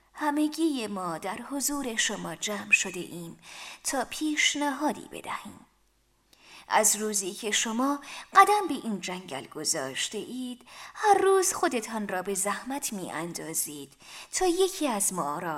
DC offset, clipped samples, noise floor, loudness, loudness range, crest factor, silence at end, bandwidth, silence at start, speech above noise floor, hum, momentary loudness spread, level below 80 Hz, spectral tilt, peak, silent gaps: under 0.1%; under 0.1%; -68 dBFS; -27 LUFS; 5 LU; 24 dB; 0 s; 16 kHz; 0.15 s; 39 dB; none; 16 LU; -62 dBFS; -2 dB/octave; -6 dBFS; none